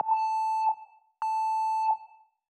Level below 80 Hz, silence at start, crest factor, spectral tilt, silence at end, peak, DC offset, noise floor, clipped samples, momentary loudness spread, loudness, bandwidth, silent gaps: under -90 dBFS; 0 s; 12 dB; 0 dB/octave; 0.45 s; -18 dBFS; under 0.1%; -54 dBFS; under 0.1%; 7 LU; -29 LUFS; 10 kHz; none